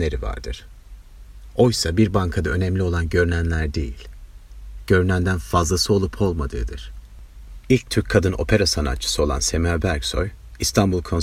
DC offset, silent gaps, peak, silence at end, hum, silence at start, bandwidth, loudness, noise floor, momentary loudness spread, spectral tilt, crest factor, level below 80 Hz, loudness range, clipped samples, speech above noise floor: under 0.1%; none; 0 dBFS; 0 s; none; 0 s; 15.5 kHz; -21 LUFS; -41 dBFS; 13 LU; -5 dB/octave; 20 dB; -32 dBFS; 2 LU; under 0.1%; 21 dB